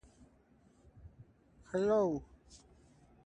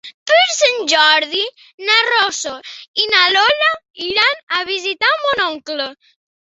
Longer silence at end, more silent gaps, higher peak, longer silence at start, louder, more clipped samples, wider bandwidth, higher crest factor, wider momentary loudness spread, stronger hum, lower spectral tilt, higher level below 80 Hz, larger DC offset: first, 0.7 s vs 0.55 s; second, none vs 0.14-0.26 s, 1.74-1.78 s, 2.88-2.94 s, 3.90-3.94 s, 4.43-4.47 s; second, -20 dBFS vs 0 dBFS; first, 1.05 s vs 0.05 s; second, -34 LUFS vs -14 LUFS; neither; first, 9.4 kHz vs 8.2 kHz; about the same, 20 dB vs 16 dB; first, 28 LU vs 13 LU; neither; first, -7 dB/octave vs 0.5 dB/octave; about the same, -64 dBFS vs -62 dBFS; neither